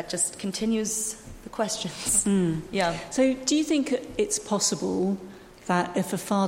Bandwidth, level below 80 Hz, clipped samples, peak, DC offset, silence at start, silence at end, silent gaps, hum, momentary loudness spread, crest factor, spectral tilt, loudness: 16.5 kHz; -52 dBFS; under 0.1%; -8 dBFS; under 0.1%; 0 s; 0 s; none; none; 8 LU; 18 dB; -3.5 dB/octave; -26 LUFS